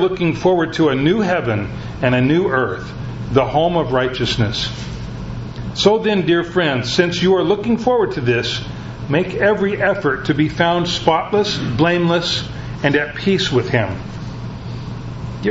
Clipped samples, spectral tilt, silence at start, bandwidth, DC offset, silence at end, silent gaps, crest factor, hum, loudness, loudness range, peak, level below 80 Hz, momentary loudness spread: under 0.1%; -6 dB/octave; 0 s; 8 kHz; under 0.1%; 0 s; none; 18 dB; none; -17 LUFS; 2 LU; 0 dBFS; -38 dBFS; 13 LU